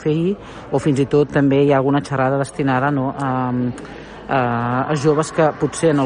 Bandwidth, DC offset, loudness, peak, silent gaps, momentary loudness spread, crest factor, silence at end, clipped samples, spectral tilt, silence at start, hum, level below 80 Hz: 10 kHz; under 0.1%; -18 LUFS; -4 dBFS; none; 8 LU; 14 dB; 0 s; under 0.1%; -7 dB/octave; 0 s; none; -48 dBFS